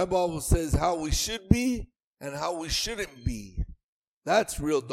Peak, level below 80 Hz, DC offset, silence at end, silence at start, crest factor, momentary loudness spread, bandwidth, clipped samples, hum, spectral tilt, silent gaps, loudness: -2 dBFS; -36 dBFS; under 0.1%; 0 s; 0 s; 26 dB; 13 LU; 16 kHz; under 0.1%; none; -4.5 dB/octave; 2.04-2.13 s, 3.83-4.22 s; -28 LUFS